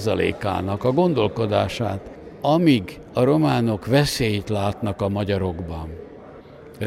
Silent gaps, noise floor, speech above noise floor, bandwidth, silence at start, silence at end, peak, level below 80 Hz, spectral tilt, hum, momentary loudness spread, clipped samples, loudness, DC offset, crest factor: none; -42 dBFS; 21 dB; 16 kHz; 0 s; 0 s; -4 dBFS; -46 dBFS; -6.5 dB/octave; none; 15 LU; under 0.1%; -22 LUFS; under 0.1%; 18 dB